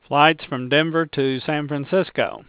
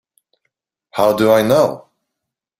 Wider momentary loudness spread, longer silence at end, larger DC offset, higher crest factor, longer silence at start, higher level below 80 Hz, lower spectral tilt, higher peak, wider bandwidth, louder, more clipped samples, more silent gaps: second, 8 LU vs 15 LU; second, 0.1 s vs 0.8 s; neither; about the same, 20 dB vs 16 dB; second, 0.1 s vs 0.95 s; second, -62 dBFS vs -56 dBFS; first, -9.5 dB/octave vs -5.5 dB/octave; about the same, 0 dBFS vs -2 dBFS; second, 4 kHz vs 16 kHz; second, -20 LUFS vs -14 LUFS; neither; neither